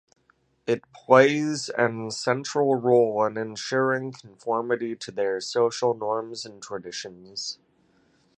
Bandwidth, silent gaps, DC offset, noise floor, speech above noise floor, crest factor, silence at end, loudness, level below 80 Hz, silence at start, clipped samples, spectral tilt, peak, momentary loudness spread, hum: 10.5 kHz; none; under 0.1%; -66 dBFS; 41 dB; 24 dB; 0.85 s; -25 LUFS; -74 dBFS; 0.65 s; under 0.1%; -4.5 dB/octave; -2 dBFS; 16 LU; none